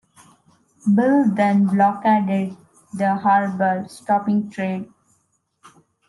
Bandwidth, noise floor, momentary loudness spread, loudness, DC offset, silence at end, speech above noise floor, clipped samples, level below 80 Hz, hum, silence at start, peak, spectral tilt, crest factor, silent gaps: 11.5 kHz; -67 dBFS; 11 LU; -19 LUFS; under 0.1%; 1.25 s; 49 dB; under 0.1%; -70 dBFS; none; 0.85 s; -6 dBFS; -8 dB/octave; 14 dB; none